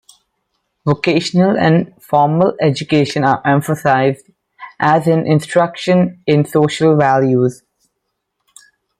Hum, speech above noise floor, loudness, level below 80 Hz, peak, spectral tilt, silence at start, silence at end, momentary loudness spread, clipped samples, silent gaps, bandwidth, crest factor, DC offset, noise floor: none; 60 dB; -14 LUFS; -56 dBFS; -2 dBFS; -6.5 dB/octave; 0.85 s; 1.45 s; 5 LU; under 0.1%; none; 14.5 kHz; 14 dB; under 0.1%; -73 dBFS